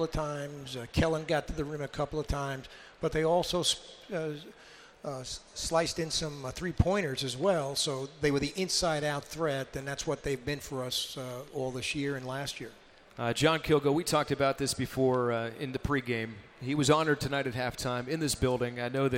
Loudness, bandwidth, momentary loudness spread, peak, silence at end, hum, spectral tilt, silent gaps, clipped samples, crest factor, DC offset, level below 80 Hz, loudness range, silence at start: -31 LUFS; 16 kHz; 12 LU; -10 dBFS; 0 s; none; -4.5 dB/octave; none; under 0.1%; 20 dB; under 0.1%; -48 dBFS; 5 LU; 0 s